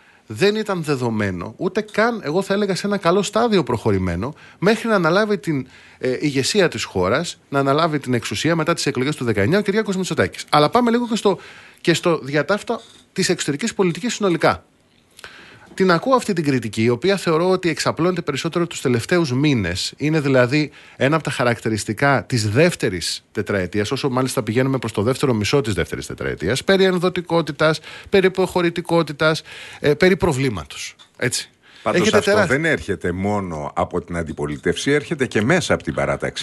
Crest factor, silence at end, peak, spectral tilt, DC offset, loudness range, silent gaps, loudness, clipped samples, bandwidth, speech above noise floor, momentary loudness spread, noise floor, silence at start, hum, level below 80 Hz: 18 dB; 0 s; -2 dBFS; -5 dB/octave; under 0.1%; 2 LU; none; -19 LUFS; under 0.1%; 12 kHz; 36 dB; 9 LU; -55 dBFS; 0.3 s; none; -48 dBFS